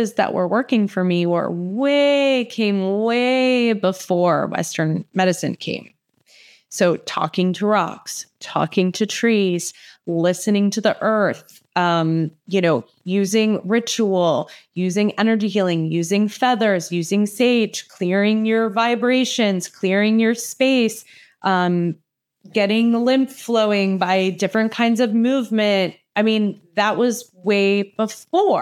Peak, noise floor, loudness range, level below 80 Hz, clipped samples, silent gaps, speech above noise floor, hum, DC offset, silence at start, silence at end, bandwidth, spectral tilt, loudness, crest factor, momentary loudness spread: -4 dBFS; -53 dBFS; 3 LU; -82 dBFS; under 0.1%; none; 34 dB; none; under 0.1%; 0 s; 0 s; 15 kHz; -5 dB/octave; -19 LUFS; 16 dB; 7 LU